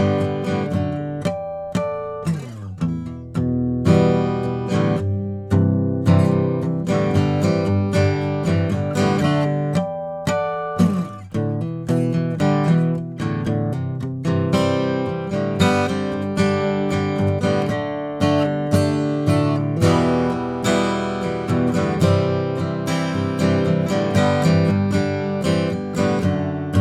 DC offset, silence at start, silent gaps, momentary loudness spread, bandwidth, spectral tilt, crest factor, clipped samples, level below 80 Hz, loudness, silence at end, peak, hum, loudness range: under 0.1%; 0 s; none; 8 LU; 13.5 kHz; -7 dB/octave; 16 dB; under 0.1%; -46 dBFS; -20 LUFS; 0 s; -2 dBFS; none; 3 LU